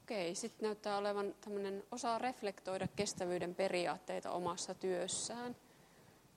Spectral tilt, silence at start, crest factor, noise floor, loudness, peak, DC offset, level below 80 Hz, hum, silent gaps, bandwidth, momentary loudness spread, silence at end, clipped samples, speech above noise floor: -3.5 dB/octave; 0.1 s; 18 dB; -65 dBFS; -41 LUFS; -22 dBFS; under 0.1%; -78 dBFS; none; none; 16.5 kHz; 6 LU; 0.25 s; under 0.1%; 24 dB